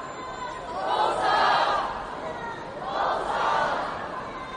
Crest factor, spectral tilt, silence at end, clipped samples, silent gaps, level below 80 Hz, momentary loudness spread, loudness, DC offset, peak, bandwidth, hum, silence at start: 16 dB; -3.5 dB/octave; 0 s; under 0.1%; none; -54 dBFS; 13 LU; -27 LUFS; under 0.1%; -10 dBFS; 10 kHz; none; 0 s